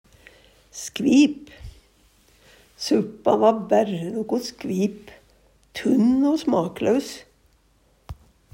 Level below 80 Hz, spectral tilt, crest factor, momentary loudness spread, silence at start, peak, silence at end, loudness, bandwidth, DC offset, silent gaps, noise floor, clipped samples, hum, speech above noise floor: -54 dBFS; -5.5 dB/octave; 18 dB; 23 LU; 0.75 s; -4 dBFS; 0.4 s; -22 LUFS; 16 kHz; under 0.1%; none; -61 dBFS; under 0.1%; none; 40 dB